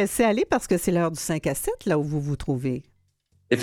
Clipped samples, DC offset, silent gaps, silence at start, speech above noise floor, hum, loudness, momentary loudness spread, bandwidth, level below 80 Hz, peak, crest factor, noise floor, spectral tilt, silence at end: under 0.1%; under 0.1%; none; 0 s; 42 dB; none; -25 LUFS; 6 LU; 18.5 kHz; -46 dBFS; -6 dBFS; 18 dB; -66 dBFS; -5.5 dB/octave; 0 s